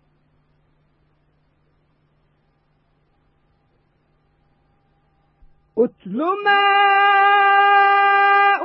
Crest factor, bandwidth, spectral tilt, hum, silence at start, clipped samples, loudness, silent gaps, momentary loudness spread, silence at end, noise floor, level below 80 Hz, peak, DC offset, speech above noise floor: 16 dB; 5.6 kHz; -7.5 dB/octave; none; 5.75 s; under 0.1%; -14 LUFS; none; 9 LU; 0 s; -63 dBFS; -66 dBFS; -4 dBFS; under 0.1%; 46 dB